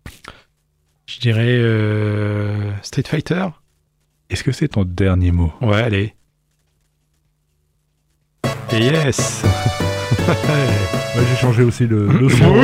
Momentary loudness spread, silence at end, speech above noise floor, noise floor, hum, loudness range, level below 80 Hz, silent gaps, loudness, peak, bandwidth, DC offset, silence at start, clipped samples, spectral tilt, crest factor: 9 LU; 0 s; 49 dB; -64 dBFS; none; 6 LU; -38 dBFS; none; -17 LUFS; -2 dBFS; 15.5 kHz; under 0.1%; 0.05 s; under 0.1%; -6 dB/octave; 16 dB